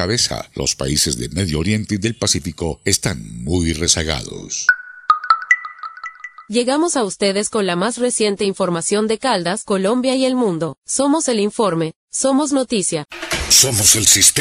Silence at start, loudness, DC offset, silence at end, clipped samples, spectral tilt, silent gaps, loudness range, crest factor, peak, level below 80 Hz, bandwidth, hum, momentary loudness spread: 0 s; -16 LUFS; under 0.1%; 0 s; under 0.1%; -2.5 dB/octave; 11.96-12.08 s; 3 LU; 18 dB; 0 dBFS; -40 dBFS; 16 kHz; none; 12 LU